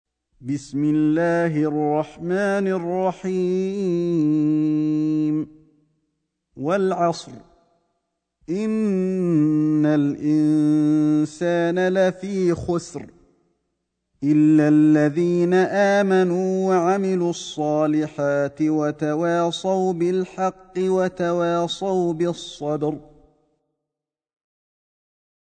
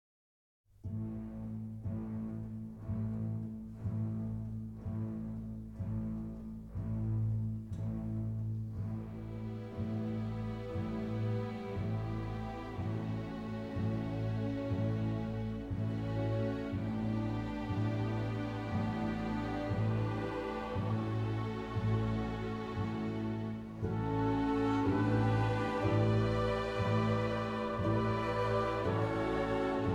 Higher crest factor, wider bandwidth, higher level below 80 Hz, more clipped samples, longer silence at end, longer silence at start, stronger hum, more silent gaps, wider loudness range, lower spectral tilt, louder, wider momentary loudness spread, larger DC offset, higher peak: about the same, 14 dB vs 16 dB; first, 9.2 kHz vs 7.6 kHz; second, -58 dBFS vs -50 dBFS; neither; first, 2.55 s vs 0 s; second, 0.4 s vs 0.85 s; neither; neither; about the same, 7 LU vs 8 LU; second, -7 dB/octave vs -8.5 dB/octave; first, -21 LUFS vs -36 LUFS; about the same, 8 LU vs 10 LU; neither; first, -6 dBFS vs -20 dBFS